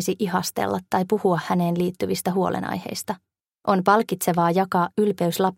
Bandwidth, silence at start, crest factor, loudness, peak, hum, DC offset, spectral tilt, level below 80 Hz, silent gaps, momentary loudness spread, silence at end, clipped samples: 16.5 kHz; 0 s; 20 dB; -23 LUFS; -2 dBFS; none; under 0.1%; -5.5 dB/octave; -62 dBFS; none; 9 LU; 0.05 s; under 0.1%